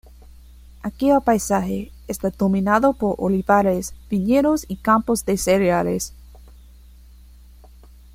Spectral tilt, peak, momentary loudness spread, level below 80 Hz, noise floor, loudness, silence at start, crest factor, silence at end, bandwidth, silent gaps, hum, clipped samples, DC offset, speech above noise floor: -5.5 dB/octave; -4 dBFS; 10 LU; -42 dBFS; -45 dBFS; -20 LUFS; 0.85 s; 18 dB; 1.8 s; 16.5 kHz; none; none; under 0.1%; under 0.1%; 26 dB